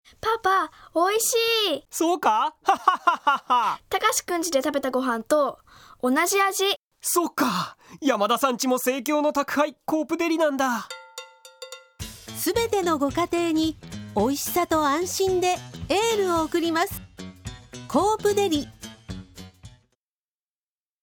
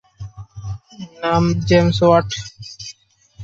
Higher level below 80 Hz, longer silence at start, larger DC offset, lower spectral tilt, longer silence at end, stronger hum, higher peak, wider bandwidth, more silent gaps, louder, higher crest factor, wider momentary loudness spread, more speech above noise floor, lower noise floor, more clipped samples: second, -54 dBFS vs -40 dBFS; about the same, 0.25 s vs 0.2 s; neither; second, -3 dB/octave vs -6 dB/octave; first, 1.35 s vs 0 s; neither; about the same, -4 dBFS vs -2 dBFS; first, 19.5 kHz vs 7.8 kHz; first, 6.77-6.91 s vs none; second, -23 LUFS vs -16 LUFS; about the same, 20 dB vs 18 dB; second, 17 LU vs 21 LU; first, over 67 dB vs 30 dB; first, under -90 dBFS vs -47 dBFS; neither